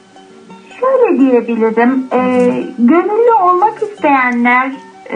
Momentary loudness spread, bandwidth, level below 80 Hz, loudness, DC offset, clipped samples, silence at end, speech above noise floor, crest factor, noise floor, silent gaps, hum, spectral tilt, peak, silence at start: 5 LU; 9.6 kHz; -66 dBFS; -11 LUFS; under 0.1%; under 0.1%; 0 s; 28 dB; 12 dB; -39 dBFS; none; none; -7 dB/octave; 0 dBFS; 0.5 s